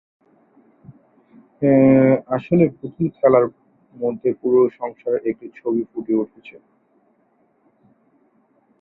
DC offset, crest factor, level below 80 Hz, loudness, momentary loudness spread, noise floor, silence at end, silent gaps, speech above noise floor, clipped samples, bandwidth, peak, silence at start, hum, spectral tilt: under 0.1%; 18 dB; -60 dBFS; -19 LUFS; 13 LU; -62 dBFS; 2.3 s; none; 44 dB; under 0.1%; 4 kHz; -2 dBFS; 0.9 s; none; -12.5 dB/octave